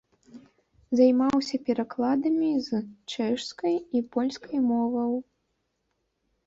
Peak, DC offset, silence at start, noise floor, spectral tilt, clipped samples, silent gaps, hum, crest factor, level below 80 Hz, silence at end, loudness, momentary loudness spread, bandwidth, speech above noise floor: -10 dBFS; under 0.1%; 0.35 s; -77 dBFS; -5.5 dB/octave; under 0.1%; none; none; 18 dB; -68 dBFS; 1.25 s; -26 LUFS; 9 LU; 7.8 kHz; 51 dB